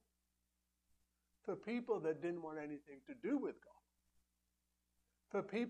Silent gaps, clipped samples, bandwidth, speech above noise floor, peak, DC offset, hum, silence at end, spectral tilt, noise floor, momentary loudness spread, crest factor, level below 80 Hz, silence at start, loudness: none; under 0.1%; 9.6 kHz; 43 dB; -28 dBFS; under 0.1%; 60 Hz at -70 dBFS; 0 s; -7 dB/octave; -86 dBFS; 12 LU; 18 dB; -84 dBFS; 1.45 s; -44 LUFS